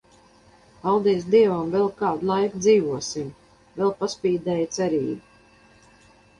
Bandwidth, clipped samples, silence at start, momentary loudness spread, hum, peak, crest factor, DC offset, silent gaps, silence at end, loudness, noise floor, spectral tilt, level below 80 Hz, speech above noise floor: 10.5 kHz; under 0.1%; 0.85 s; 12 LU; none; -6 dBFS; 16 dB; under 0.1%; none; 1.2 s; -23 LUFS; -54 dBFS; -5.5 dB/octave; -60 dBFS; 33 dB